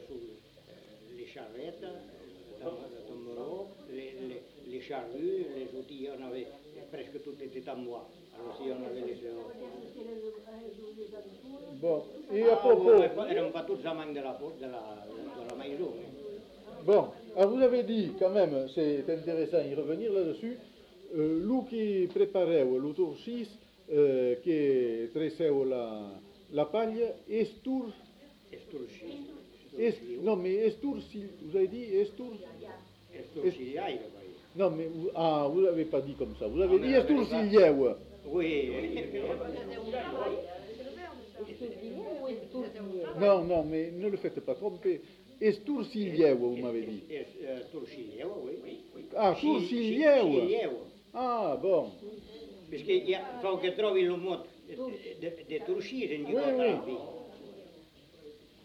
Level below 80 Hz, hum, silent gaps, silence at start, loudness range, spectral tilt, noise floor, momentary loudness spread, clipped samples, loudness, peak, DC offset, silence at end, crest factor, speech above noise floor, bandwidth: -62 dBFS; none; none; 0 s; 14 LU; -7.5 dB/octave; -57 dBFS; 20 LU; under 0.1%; -31 LUFS; -10 dBFS; under 0.1%; 0.3 s; 22 dB; 26 dB; 8 kHz